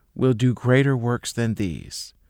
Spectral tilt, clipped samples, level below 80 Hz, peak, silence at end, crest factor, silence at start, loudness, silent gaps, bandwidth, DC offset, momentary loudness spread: -6.5 dB/octave; under 0.1%; -50 dBFS; -6 dBFS; 0.2 s; 16 dB; 0.15 s; -22 LUFS; none; 15.5 kHz; under 0.1%; 11 LU